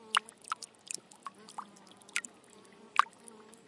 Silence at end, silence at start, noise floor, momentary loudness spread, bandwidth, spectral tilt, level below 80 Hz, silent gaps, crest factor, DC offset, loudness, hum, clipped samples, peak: 0.65 s; 0.1 s; -58 dBFS; 24 LU; 11.5 kHz; 0.5 dB/octave; under -90 dBFS; none; 32 dB; under 0.1%; -37 LUFS; none; under 0.1%; -8 dBFS